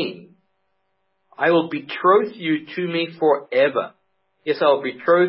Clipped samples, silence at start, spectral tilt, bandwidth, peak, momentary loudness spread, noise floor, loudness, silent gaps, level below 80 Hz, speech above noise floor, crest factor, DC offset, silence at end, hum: under 0.1%; 0 s; -10 dB/octave; 5.8 kHz; -4 dBFS; 10 LU; -72 dBFS; -20 LUFS; none; -80 dBFS; 53 dB; 16 dB; under 0.1%; 0 s; none